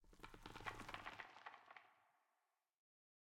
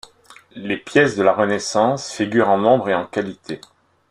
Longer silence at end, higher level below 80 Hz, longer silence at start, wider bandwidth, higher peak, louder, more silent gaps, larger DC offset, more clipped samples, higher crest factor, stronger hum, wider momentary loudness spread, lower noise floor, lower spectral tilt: first, 1.15 s vs 0.55 s; second, -72 dBFS vs -60 dBFS; second, 0 s vs 0.55 s; first, 16.5 kHz vs 11.5 kHz; second, -32 dBFS vs -2 dBFS; second, -56 LUFS vs -18 LUFS; neither; neither; neither; first, 28 dB vs 18 dB; neither; second, 11 LU vs 16 LU; first, -90 dBFS vs -48 dBFS; second, -3.5 dB/octave vs -5 dB/octave